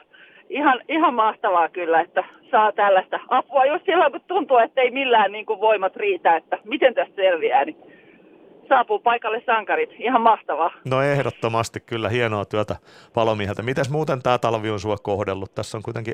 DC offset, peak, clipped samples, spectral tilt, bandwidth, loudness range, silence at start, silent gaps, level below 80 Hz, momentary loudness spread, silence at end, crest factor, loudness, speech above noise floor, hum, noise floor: under 0.1%; -2 dBFS; under 0.1%; -5.5 dB/octave; 13 kHz; 4 LU; 0.5 s; none; -62 dBFS; 8 LU; 0 s; 18 dB; -21 LUFS; 30 dB; none; -50 dBFS